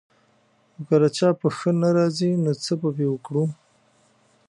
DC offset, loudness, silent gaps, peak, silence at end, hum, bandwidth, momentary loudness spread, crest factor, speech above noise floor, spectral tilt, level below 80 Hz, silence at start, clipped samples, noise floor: under 0.1%; -22 LUFS; none; -6 dBFS; 0.95 s; none; 11.5 kHz; 6 LU; 18 dB; 41 dB; -7 dB/octave; -70 dBFS; 0.8 s; under 0.1%; -62 dBFS